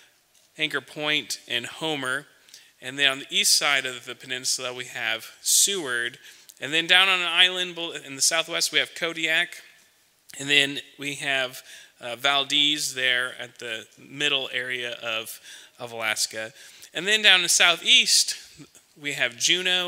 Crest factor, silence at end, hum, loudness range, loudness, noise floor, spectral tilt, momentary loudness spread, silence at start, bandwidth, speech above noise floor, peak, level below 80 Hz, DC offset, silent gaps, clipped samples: 24 dB; 0 s; none; 7 LU; -22 LUFS; -61 dBFS; 0 dB/octave; 18 LU; 0.6 s; 16 kHz; 36 dB; 0 dBFS; -80 dBFS; under 0.1%; none; under 0.1%